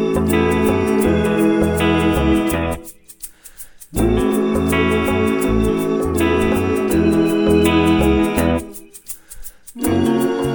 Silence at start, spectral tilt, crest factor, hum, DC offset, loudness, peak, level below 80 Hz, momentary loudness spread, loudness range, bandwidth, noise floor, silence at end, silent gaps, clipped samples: 0 s; -6 dB/octave; 14 dB; none; under 0.1%; -17 LUFS; -2 dBFS; -30 dBFS; 19 LU; 3 LU; over 20 kHz; -39 dBFS; 0 s; none; under 0.1%